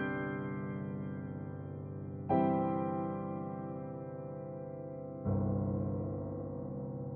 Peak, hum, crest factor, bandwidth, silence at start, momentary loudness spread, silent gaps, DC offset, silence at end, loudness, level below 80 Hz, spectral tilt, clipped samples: -18 dBFS; none; 18 dB; 3.4 kHz; 0 s; 11 LU; none; under 0.1%; 0 s; -38 LUFS; -60 dBFS; -9 dB/octave; under 0.1%